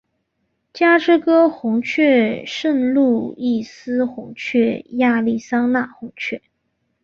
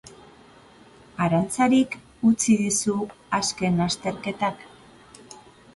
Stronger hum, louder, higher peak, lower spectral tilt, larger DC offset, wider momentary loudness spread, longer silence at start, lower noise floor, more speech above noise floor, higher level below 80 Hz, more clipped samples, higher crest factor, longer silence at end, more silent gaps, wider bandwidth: neither; first, -18 LUFS vs -23 LUFS; first, -4 dBFS vs -8 dBFS; about the same, -5.5 dB/octave vs -4.5 dB/octave; neither; about the same, 12 LU vs 11 LU; first, 0.75 s vs 0.05 s; first, -71 dBFS vs -51 dBFS; first, 53 dB vs 28 dB; second, -62 dBFS vs -56 dBFS; neither; about the same, 16 dB vs 18 dB; first, 0.65 s vs 0.4 s; neither; second, 7 kHz vs 11.5 kHz